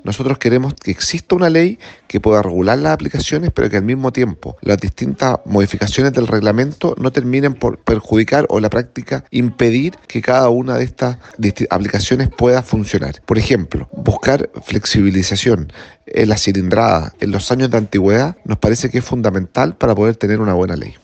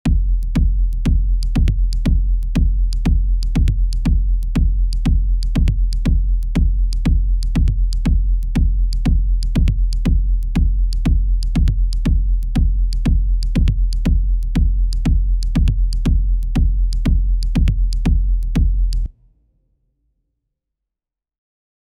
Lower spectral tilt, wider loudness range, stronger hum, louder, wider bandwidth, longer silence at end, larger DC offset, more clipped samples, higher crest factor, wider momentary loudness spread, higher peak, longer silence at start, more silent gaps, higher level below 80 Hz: second, -6 dB/octave vs -7.5 dB/octave; about the same, 1 LU vs 2 LU; neither; first, -15 LUFS vs -19 LUFS; first, 8.8 kHz vs 7.4 kHz; second, 0.1 s vs 2.9 s; neither; neither; about the same, 14 dB vs 12 dB; first, 7 LU vs 2 LU; first, 0 dBFS vs -4 dBFS; about the same, 0.05 s vs 0.05 s; neither; second, -36 dBFS vs -16 dBFS